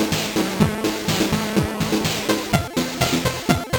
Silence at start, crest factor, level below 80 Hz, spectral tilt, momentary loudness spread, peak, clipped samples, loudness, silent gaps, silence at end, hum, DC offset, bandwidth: 0 s; 20 dB; -40 dBFS; -4.5 dB/octave; 2 LU; 0 dBFS; under 0.1%; -21 LUFS; none; 0 s; none; under 0.1%; 19 kHz